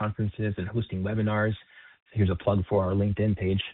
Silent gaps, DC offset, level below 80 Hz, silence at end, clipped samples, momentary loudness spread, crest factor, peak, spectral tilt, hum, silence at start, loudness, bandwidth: 2.02-2.06 s; under 0.1%; -48 dBFS; 0 s; under 0.1%; 6 LU; 18 dB; -10 dBFS; -6.5 dB/octave; none; 0 s; -28 LUFS; 4.1 kHz